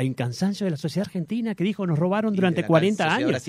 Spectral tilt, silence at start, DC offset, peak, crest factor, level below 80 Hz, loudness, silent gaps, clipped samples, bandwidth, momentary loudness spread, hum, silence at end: -6.5 dB/octave; 0 s; under 0.1%; -4 dBFS; 20 dB; -64 dBFS; -24 LUFS; none; under 0.1%; 14 kHz; 7 LU; none; 0 s